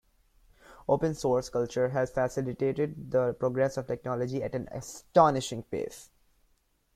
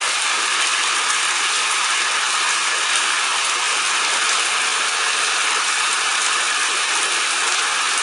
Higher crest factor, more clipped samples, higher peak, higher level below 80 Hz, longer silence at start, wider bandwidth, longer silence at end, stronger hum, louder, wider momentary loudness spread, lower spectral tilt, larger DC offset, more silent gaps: first, 22 dB vs 16 dB; neither; second, -8 dBFS vs -2 dBFS; first, -58 dBFS vs -74 dBFS; first, 0.7 s vs 0 s; second, 14.5 kHz vs 16 kHz; first, 0.9 s vs 0 s; neither; second, -29 LUFS vs -17 LUFS; first, 12 LU vs 1 LU; first, -6 dB/octave vs 3 dB/octave; neither; neither